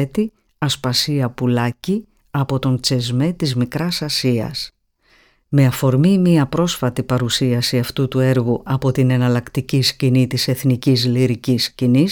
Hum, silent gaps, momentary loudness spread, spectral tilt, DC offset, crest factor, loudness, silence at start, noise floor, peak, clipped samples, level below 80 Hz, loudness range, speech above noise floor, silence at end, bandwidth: none; none; 6 LU; -6 dB/octave; under 0.1%; 14 dB; -18 LUFS; 0 s; -56 dBFS; -4 dBFS; under 0.1%; -48 dBFS; 3 LU; 40 dB; 0 s; 19 kHz